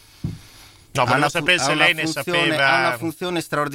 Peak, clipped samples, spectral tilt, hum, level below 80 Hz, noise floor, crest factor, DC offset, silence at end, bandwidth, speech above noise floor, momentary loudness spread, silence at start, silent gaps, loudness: -2 dBFS; under 0.1%; -3.5 dB/octave; none; -52 dBFS; -46 dBFS; 18 dB; under 0.1%; 0 s; 16.5 kHz; 27 dB; 12 LU; 0.25 s; none; -18 LUFS